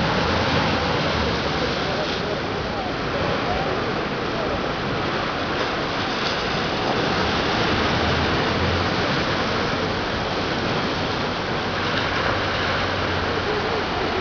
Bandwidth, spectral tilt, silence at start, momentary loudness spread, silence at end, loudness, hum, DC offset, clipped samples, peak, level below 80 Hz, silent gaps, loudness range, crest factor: 5.4 kHz; -5 dB/octave; 0 s; 4 LU; 0 s; -22 LUFS; none; under 0.1%; under 0.1%; -8 dBFS; -38 dBFS; none; 3 LU; 14 dB